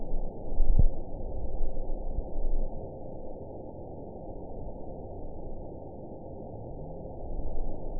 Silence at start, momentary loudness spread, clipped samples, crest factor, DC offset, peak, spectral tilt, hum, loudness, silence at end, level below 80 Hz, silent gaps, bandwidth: 0 s; 11 LU; under 0.1%; 18 dB; 0.5%; -10 dBFS; -16 dB/octave; none; -39 LUFS; 0 s; -30 dBFS; none; 1 kHz